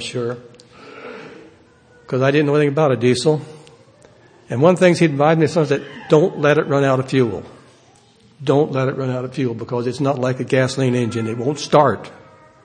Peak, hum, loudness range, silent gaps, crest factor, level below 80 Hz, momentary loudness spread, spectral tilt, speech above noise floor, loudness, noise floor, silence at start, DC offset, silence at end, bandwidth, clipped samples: 0 dBFS; none; 5 LU; none; 18 dB; -60 dBFS; 13 LU; -6.5 dB/octave; 34 dB; -18 LUFS; -51 dBFS; 0 s; under 0.1%; 0.5 s; 9.8 kHz; under 0.1%